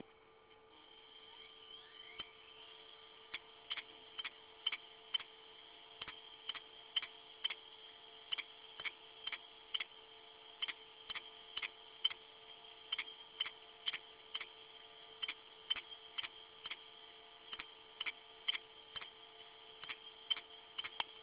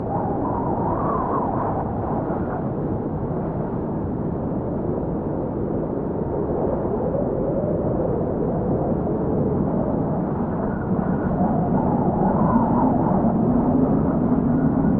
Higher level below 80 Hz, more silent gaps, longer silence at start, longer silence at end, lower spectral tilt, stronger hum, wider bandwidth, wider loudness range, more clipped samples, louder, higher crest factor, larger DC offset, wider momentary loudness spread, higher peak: second, -82 dBFS vs -36 dBFS; neither; about the same, 0 s vs 0 s; about the same, 0 s vs 0 s; second, 3.5 dB/octave vs -12 dB/octave; neither; first, 4 kHz vs 3.1 kHz; second, 3 LU vs 6 LU; neither; second, -45 LUFS vs -22 LUFS; first, 28 dB vs 16 dB; neither; first, 15 LU vs 6 LU; second, -20 dBFS vs -6 dBFS